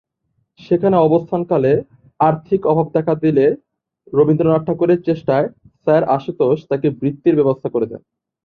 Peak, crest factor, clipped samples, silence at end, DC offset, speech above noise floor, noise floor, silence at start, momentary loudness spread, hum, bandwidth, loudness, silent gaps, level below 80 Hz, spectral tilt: -2 dBFS; 16 dB; under 0.1%; 0.45 s; under 0.1%; 53 dB; -68 dBFS; 0.7 s; 7 LU; none; 5 kHz; -17 LUFS; none; -56 dBFS; -10.5 dB/octave